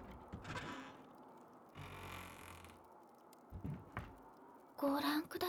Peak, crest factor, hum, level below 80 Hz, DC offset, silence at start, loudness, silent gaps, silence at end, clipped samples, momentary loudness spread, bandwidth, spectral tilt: -28 dBFS; 20 dB; none; -66 dBFS; under 0.1%; 0 s; -45 LUFS; none; 0 s; under 0.1%; 22 LU; over 20 kHz; -5 dB/octave